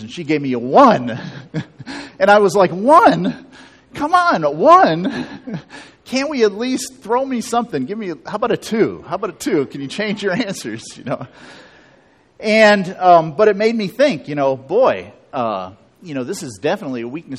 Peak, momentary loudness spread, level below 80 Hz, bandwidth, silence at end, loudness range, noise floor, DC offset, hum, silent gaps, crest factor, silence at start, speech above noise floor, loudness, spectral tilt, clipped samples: 0 dBFS; 18 LU; -58 dBFS; 14 kHz; 0 s; 7 LU; -52 dBFS; under 0.1%; none; none; 16 dB; 0 s; 36 dB; -16 LUFS; -5 dB/octave; under 0.1%